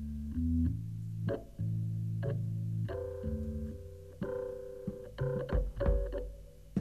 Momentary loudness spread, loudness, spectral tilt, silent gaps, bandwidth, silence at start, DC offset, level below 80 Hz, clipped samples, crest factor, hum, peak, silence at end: 10 LU; -37 LUFS; -9.5 dB/octave; none; 13.5 kHz; 0 s; 0.1%; -42 dBFS; under 0.1%; 16 dB; none; -20 dBFS; 0 s